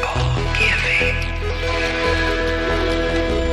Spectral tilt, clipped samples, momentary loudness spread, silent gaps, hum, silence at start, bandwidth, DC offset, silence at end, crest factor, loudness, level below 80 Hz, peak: -5 dB/octave; under 0.1%; 6 LU; none; none; 0 s; 12.5 kHz; under 0.1%; 0 s; 14 dB; -19 LUFS; -26 dBFS; -4 dBFS